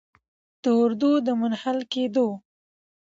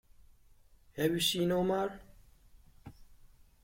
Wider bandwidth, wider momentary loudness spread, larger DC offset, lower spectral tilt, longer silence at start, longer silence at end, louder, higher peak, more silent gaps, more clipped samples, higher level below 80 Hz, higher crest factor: second, 7.6 kHz vs 16.5 kHz; second, 7 LU vs 17 LU; neither; first, -6 dB/octave vs -4.5 dB/octave; second, 0.65 s vs 0.95 s; first, 0.65 s vs 0.5 s; first, -24 LUFS vs -32 LUFS; first, -12 dBFS vs -18 dBFS; neither; neither; second, -74 dBFS vs -60 dBFS; about the same, 14 dB vs 18 dB